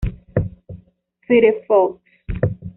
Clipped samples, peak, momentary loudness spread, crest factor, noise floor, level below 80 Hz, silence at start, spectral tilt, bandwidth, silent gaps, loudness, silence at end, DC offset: under 0.1%; -4 dBFS; 16 LU; 16 dB; -56 dBFS; -34 dBFS; 0 s; -7 dB/octave; 3.9 kHz; none; -18 LUFS; 0.05 s; under 0.1%